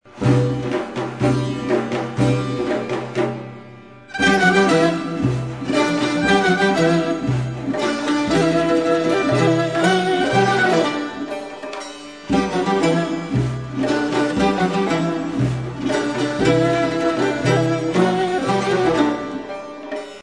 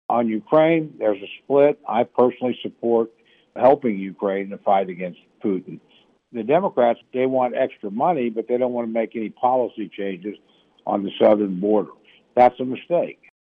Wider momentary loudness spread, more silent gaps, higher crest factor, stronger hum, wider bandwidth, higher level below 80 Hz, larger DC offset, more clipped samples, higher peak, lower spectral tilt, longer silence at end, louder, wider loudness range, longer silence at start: about the same, 11 LU vs 13 LU; neither; about the same, 16 dB vs 18 dB; neither; first, 11 kHz vs 4.9 kHz; first, -46 dBFS vs -68 dBFS; first, 0.2% vs under 0.1%; neither; about the same, -4 dBFS vs -4 dBFS; second, -6 dB/octave vs -9 dB/octave; second, 0 s vs 0.35 s; about the same, -19 LUFS vs -21 LUFS; about the same, 4 LU vs 3 LU; about the same, 0.15 s vs 0.1 s